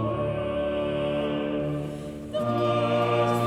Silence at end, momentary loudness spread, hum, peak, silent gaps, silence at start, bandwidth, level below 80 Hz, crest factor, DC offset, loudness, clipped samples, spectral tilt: 0 s; 9 LU; none; -12 dBFS; none; 0 s; 14.5 kHz; -50 dBFS; 14 dB; under 0.1%; -27 LUFS; under 0.1%; -7 dB/octave